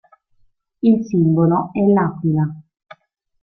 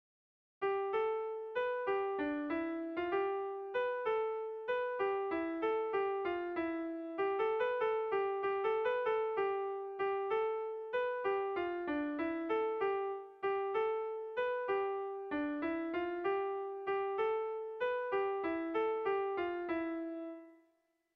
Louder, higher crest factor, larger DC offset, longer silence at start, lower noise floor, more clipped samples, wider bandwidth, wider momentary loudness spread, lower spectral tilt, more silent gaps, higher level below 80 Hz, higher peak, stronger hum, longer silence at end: first, -17 LUFS vs -37 LUFS; about the same, 14 dB vs 12 dB; neither; first, 0.85 s vs 0.6 s; second, -59 dBFS vs -77 dBFS; neither; first, 6.2 kHz vs 5.4 kHz; about the same, 5 LU vs 5 LU; first, -10.5 dB/octave vs -6.5 dB/octave; neither; first, -56 dBFS vs -74 dBFS; first, -4 dBFS vs -24 dBFS; neither; first, 0.8 s vs 0.6 s